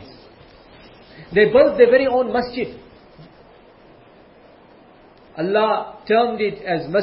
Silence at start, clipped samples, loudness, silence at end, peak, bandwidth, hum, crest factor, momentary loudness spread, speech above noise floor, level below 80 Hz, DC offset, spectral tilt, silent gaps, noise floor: 0 s; under 0.1%; -18 LUFS; 0 s; 0 dBFS; 5.8 kHz; none; 20 dB; 14 LU; 31 dB; -54 dBFS; under 0.1%; -10 dB/octave; none; -48 dBFS